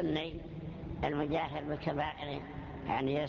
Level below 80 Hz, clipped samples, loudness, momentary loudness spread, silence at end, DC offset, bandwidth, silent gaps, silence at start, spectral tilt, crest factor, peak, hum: -52 dBFS; under 0.1%; -37 LUFS; 10 LU; 0 s; under 0.1%; 7 kHz; none; 0 s; -5 dB/octave; 16 dB; -20 dBFS; none